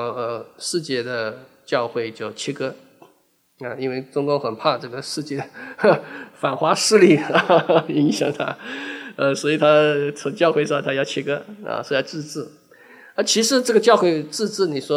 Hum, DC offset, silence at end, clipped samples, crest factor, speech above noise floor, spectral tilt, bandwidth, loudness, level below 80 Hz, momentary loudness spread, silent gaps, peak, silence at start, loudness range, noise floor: none; under 0.1%; 0 s; under 0.1%; 18 dB; 41 dB; -4 dB/octave; 16 kHz; -20 LUFS; -72 dBFS; 15 LU; none; -2 dBFS; 0 s; 9 LU; -61 dBFS